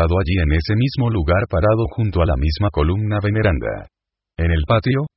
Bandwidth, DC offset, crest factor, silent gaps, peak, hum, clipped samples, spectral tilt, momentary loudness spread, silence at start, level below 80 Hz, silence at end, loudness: 5.8 kHz; under 0.1%; 16 dB; none; -2 dBFS; none; under 0.1%; -11.5 dB/octave; 5 LU; 0 s; -24 dBFS; 0.1 s; -18 LUFS